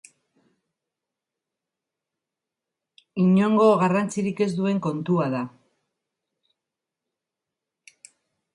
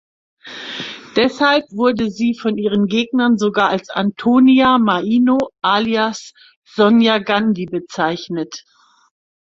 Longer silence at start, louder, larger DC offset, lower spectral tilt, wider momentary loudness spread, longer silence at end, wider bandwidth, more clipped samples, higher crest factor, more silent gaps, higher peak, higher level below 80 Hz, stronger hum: first, 3.15 s vs 0.45 s; second, -22 LUFS vs -16 LUFS; neither; first, -7.5 dB/octave vs -5.5 dB/octave; second, 11 LU vs 15 LU; first, 3.05 s vs 1 s; first, 11 kHz vs 7.6 kHz; neither; about the same, 20 dB vs 16 dB; second, none vs 6.56-6.62 s; second, -6 dBFS vs 0 dBFS; second, -70 dBFS vs -56 dBFS; neither